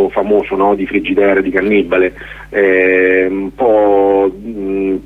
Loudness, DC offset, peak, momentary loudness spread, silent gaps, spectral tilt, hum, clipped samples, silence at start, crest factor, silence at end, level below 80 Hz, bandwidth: -12 LUFS; under 0.1%; 0 dBFS; 8 LU; none; -7.5 dB/octave; none; under 0.1%; 0 s; 12 dB; 0 s; -40 dBFS; 4.1 kHz